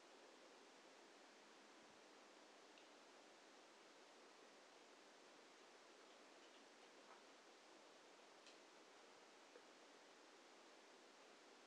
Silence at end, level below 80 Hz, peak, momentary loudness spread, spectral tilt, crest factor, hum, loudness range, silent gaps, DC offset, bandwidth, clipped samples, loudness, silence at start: 0 s; under -90 dBFS; -52 dBFS; 1 LU; -1 dB/octave; 16 dB; none; 0 LU; none; under 0.1%; 10.5 kHz; under 0.1%; -66 LUFS; 0 s